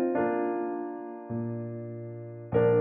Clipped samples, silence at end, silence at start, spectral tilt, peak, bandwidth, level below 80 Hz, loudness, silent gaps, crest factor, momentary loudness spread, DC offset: under 0.1%; 0 s; 0 s; -8.5 dB/octave; -12 dBFS; 3.5 kHz; -62 dBFS; -32 LUFS; none; 16 dB; 13 LU; under 0.1%